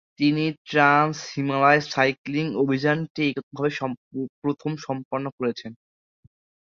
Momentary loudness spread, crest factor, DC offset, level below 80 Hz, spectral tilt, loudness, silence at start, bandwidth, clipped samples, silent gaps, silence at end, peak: 12 LU; 22 dB; under 0.1%; -66 dBFS; -6 dB/octave; -23 LUFS; 0.2 s; 7.4 kHz; under 0.1%; 0.58-0.65 s, 2.18-2.25 s, 3.10-3.15 s, 3.43-3.51 s, 3.97-4.11 s, 4.29-4.42 s, 5.05-5.11 s, 5.32-5.38 s; 0.95 s; -2 dBFS